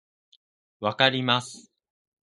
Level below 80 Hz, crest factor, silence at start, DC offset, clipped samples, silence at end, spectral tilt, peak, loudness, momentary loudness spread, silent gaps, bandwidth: -70 dBFS; 26 dB; 0.8 s; under 0.1%; under 0.1%; 0.75 s; -4 dB/octave; -2 dBFS; -24 LUFS; 11 LU; none; 11.5 kHz